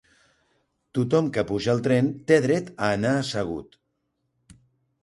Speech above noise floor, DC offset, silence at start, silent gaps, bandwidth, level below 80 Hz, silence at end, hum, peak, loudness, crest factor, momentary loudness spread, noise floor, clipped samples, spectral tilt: 53 dB; under 0.1%; 0.95 s; none; 11.5 kHz; -56 dBFS; 1.4 s; none; -4 dBFS; -24 LUFS; 20 dB; 9 LU; -75 dBFS; under 0.1%; -6.5 dB/octave